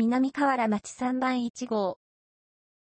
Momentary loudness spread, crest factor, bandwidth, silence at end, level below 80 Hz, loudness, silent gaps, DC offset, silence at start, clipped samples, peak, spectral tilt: 6 LU; 14 dB; 8.8 kHz; 0.95 s; -70 dBFS; -28 LUFS; 1.50-1.54 s; under 0.1%; 0 s; under 0.1%; -14 dBFS; -5 dB/octave